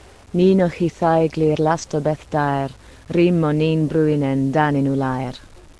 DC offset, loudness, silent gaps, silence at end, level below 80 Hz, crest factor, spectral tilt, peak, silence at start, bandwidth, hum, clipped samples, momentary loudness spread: under 0.1%; -19 LUFS; none; 0.35 s; -46 dBFS; 16 dB; -7.5 dB/octave; -4 dBFS; 0.35 s; 11 kHz; none; under 0.1%; 8 LU